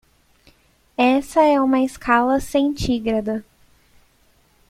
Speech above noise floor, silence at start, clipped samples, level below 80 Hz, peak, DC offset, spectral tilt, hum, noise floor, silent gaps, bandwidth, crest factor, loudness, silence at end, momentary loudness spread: 40 dB; 1 s; under 0.1%; -44 dBFS; -4 dBFS; under 0.1%; -5.5 dB/octave; none; -58 dBFS; none; 15.5 kHz; 18 dB; -19 LUFS; 1.3 s; 9 LU